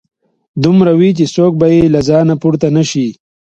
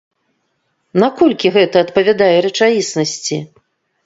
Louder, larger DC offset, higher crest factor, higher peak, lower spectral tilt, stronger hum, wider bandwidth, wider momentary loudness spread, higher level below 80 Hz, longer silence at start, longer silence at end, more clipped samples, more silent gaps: first, -11 LUFS vs -14 LUFS; neither; about the same, 10 dB vs 14 dB; about the same, 0 dBFS vs 0 dBFS; first, -7 dB/octave vs -4.5 dB/octave; neither; about the same, 8.2 kHz vs 8 kHz; about the same, 7 LU vs 9 LU; first, -42 dBFS vs -58 dBFS; second, 0.55 s vs 0.95 s; second, 0.45 s vs 0.6 s; neither; neither